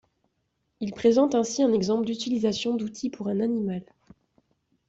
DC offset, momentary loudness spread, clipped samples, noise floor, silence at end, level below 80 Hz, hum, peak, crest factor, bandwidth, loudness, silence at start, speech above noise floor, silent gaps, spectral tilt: under 0.1%; 11 LU; under 0.1%; -76 dBFS; 1.05 s; -64 dBFS; none; -10 dBFS; 18 dB; 8 kHz; -26 LUFS; 0.8 s; 51 dB; none; -5.5 dB/octave